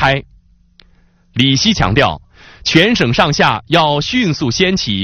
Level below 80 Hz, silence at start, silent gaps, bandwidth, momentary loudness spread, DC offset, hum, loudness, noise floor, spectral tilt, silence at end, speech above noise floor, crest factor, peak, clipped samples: -36 dBFS; 0 s; none; 11.5 kHz; 7 LU; under 0.1%; none; -13 LUFS; -50 dBFS; -4.5 dB/octave; 0 s; 37 dB; 14 dB; 0 dBFS; 0.1%